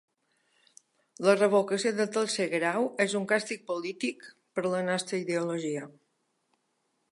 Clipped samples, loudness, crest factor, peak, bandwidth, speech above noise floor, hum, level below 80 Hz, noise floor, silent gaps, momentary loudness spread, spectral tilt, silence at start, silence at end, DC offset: under 0.1%; -29 LUFS; 20 dB; -10 dBFS; 11.5 kHz; 48 dB; none; -84 dBFS; -76 dBFS; none; 10 LU; -4 dB/octave; 1.2 s; 1.2 s; under 0.1%